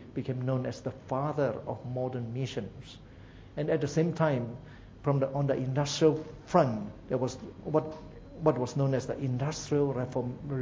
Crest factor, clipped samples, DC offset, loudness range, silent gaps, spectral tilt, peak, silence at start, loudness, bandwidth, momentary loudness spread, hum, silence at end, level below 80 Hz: 22 dB; under 0.1%; under 0.1%; 5 LU; none; -6.5 dB/octave; -8 dBFS; 0 s; -31 LUFS; 7.8 kHz; 16 LU; none; 0 s; -56 dBFS